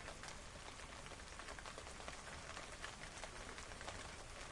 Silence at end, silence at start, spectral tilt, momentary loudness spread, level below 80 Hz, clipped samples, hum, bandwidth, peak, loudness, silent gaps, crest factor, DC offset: 0 s; 0 s; -2.5 dB/octave; 3 LU; -60 dBFS; under 0.1%; none; 11.5 kHz; -30 dBFS; -52 LUFS; none; 22 dB; under 0.1%